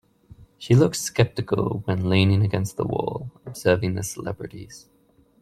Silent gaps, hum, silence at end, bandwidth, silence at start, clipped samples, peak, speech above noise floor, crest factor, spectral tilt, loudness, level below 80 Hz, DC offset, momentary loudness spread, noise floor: none; none; 0.6 s; 14.5 kHz; 0.4 s; under 0.1%; -2 dBFS; 27 dB; 20 dB; -6 dB/octave; -23 LUFS; -52 dBFS; under 0.1%; 18 LU; -50 dBFS